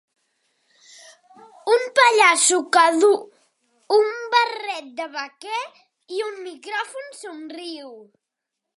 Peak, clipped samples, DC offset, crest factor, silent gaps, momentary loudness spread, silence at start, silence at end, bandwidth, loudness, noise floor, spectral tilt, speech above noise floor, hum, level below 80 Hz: 0 dBFS; under 0.1%; under 0.1%; 22 dB; none; 21 LU; 1.65 s; 0.75 s; 11.5 kHz; -19 LUFS; -83 dBFS; 1 dB/octave; 62 dB; none; -86 dBFS